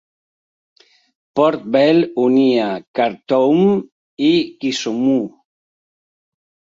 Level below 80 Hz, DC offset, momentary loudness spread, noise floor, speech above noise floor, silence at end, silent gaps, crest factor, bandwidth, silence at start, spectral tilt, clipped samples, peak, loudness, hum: -64 dBFS; under 0.1%; 8 LU; under -90 dBFS; over 75 dB; 1.45 s; 2.87-2.94 s, 3.92-4.17 s; 16 dB; 7.8 kHz; 1.35 s; -6 dB/octave; under 0.1%; -2 dBFS; -16 LUFS; none